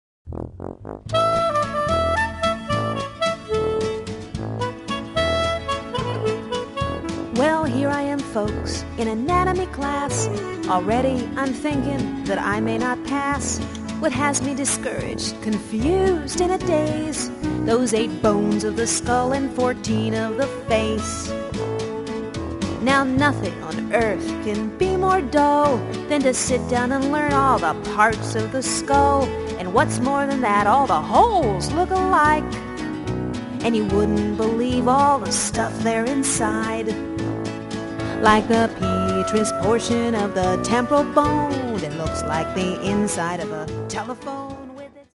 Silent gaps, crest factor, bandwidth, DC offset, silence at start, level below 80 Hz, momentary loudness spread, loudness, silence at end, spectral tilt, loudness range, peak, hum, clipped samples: none; 20 dB; 11.5 kHz; under 0.1%; 0.25 s; -38 dBFS; 10 LU; -21 LUFS; 0.1 s; -4.5 dB/octave; 5 LU; -2 dBFS; none; under 0.1%